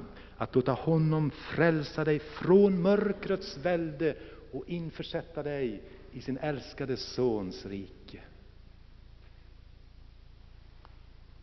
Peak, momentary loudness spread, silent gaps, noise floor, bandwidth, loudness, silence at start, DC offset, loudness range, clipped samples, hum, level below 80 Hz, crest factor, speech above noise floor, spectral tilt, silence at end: -10 dBFS; 18 LU; none; -52 dBFS; 6.2 kHz; -30 LUFS; 0 s; under 0.1%; 11 LU; under 0.1%; none; -54 dBFS; 22 dB; 23 dB; -6.5 dB/octave; 0 s